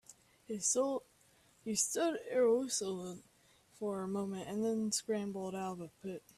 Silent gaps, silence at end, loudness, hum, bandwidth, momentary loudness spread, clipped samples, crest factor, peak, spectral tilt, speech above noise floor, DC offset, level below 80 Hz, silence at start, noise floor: none; 0.2 s; -36 LUFS; none; 14.5 kHz; 14 LU; under 0.1%; 18 dB; -20 dBFS; -3.5 dB/octave; 32 dB; under 0.1%; -76 dBFS; 0.1 s; -68 dBFS